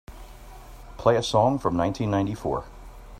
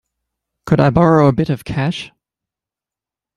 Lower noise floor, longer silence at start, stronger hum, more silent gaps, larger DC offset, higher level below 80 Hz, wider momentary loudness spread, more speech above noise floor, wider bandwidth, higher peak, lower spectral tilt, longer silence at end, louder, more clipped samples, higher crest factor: second, -43 dBFS vs -88 dBFS; second, 0.1 s vs 0.65 s; neither; neither; neither; about the same, -44 dBFS vs -44 dBFS; about the same, 11 LU vs 13 LU; second, 20 dB vs 75 dB; first, 16 kHz vs 12.5 kHz; second, -6 dBFS vs -2 dBFS; second, -6 dB/octave vs -8 dB/octave; second, 0 s vs 1.3 s; second, -24 LUFS vs -15 LUFS; neither; about the same, 20 dB vs 16 dB